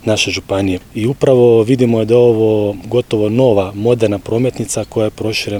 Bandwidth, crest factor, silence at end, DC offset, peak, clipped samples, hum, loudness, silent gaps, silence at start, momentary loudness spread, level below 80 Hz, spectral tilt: 18.5 kHz; 12 dB; 0 s; under 0.1%; 0 dBFS; under 0.1%; none; -14 LUFS; none; 0.05 s; 8 LU; -44 dBFS; -6 dB/octave